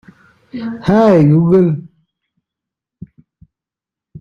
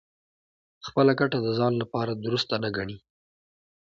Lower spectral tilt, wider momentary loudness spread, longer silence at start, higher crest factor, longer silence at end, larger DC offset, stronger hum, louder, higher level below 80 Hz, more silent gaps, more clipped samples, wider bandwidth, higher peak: first, -9.5 dB/octave vs -6.5 dB/octave; first, 17 LU vs 14 LU; second, 0.55 s vs 0.85 s; second, 14 dB vs 20 dB; second, 0 s vs 1 s; neither; neither; first, -12 LUFS vs -26 LUFS; first, -50 dBFS vs -62 dBFS; neither; neither; about the same, 7 kHz vs 7.6 kHz; first, -2 dBFS vs -8 dBFS